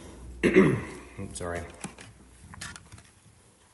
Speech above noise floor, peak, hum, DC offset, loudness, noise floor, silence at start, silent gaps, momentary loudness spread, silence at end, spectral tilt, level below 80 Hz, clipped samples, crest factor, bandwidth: 32 dB; -6 dBFS; none; under 0.1%; -26 LUFS; -58 dBFS; 0 s; none; 26 LU; 0.8 s; -6 dB/octave; -52 dBFS; under 0.1%; 24 dB; 11.5 kHz